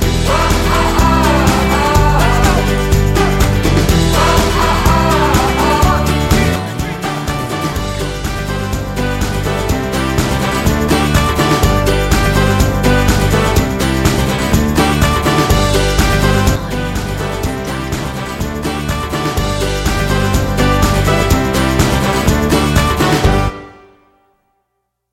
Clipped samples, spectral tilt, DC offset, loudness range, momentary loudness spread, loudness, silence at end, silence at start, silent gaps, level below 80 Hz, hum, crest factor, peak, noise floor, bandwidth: under 0.1%; -5 dB/octave; under 0.1%; 5 LU; 8 LU; -13 LUFS; 1.4 s; 0 s; none; -20 dBFS; none; 12 dB; 0 dBFS; -70 dBFS; 16.5 kHz